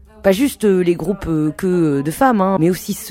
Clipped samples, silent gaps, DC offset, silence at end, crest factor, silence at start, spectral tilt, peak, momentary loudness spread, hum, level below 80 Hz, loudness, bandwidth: under 0.1%; none; under 0.1%; 0 s; 16 dB; 0.2 s; -6.5 dB/octave; 0 dBFS; 5 LU; none; -42 dBFS; -17 LUFS; 16.5 kHz